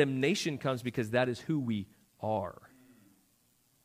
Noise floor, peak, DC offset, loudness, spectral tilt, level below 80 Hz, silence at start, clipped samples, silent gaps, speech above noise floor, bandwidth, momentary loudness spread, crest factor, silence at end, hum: -70 dBFS; -14 dBFS; under 0.1%; -33 LUFS; -5.5 dB/octave; -72 dBFS; 0 s; under 0.1%; none; 38 dB; 15.5 kHz; 10 LU; 20 dB; 1.2 s; none